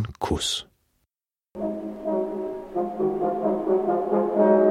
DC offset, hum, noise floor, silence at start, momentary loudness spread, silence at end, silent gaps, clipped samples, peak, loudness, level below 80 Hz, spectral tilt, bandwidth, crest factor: under 0.1%; none; under -90 dBFS; 0 s; 11 LU; 0 s; none; under 0.1%; -6 dBFS; -25 LUFS; -48 dBFS; -5 dB/octave; 13 kHz; 18 dB